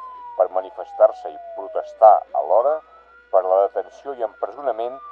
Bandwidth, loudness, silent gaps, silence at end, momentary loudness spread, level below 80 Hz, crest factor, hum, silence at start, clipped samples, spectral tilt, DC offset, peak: 4.5 kHz; -20 LUFS; none; 0 s; 18 LU; -68 dBFS; 20 dB; none; 0 s; under 0.1%; -5 dB/octave; under 0.1%; 0 dBFS